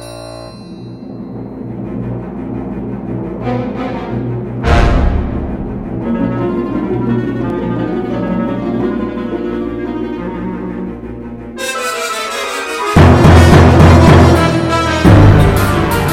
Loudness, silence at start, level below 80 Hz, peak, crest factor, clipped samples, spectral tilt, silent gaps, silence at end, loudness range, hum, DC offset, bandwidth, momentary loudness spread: -13 LUFS; 0 s; -22 dBFS; 0 dBFS; 12 dB; 2%; -6.5 dB/octave; none; 0 s; 14 LU; none; under 0.1%; 16 kHz; 20 LU